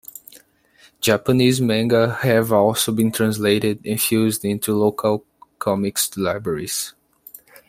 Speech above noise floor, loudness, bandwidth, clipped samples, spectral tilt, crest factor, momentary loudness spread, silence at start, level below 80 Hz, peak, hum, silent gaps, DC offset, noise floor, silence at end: 35 dB; -19 LUFS; 16.5 kHz; under 0.1%; -4.5 dB/octave; 18 dB; 8 LU; 1 s; -56 dBFS; -2 dBFS; none; none; under 0.1%; -54 dBFS; 0.8 s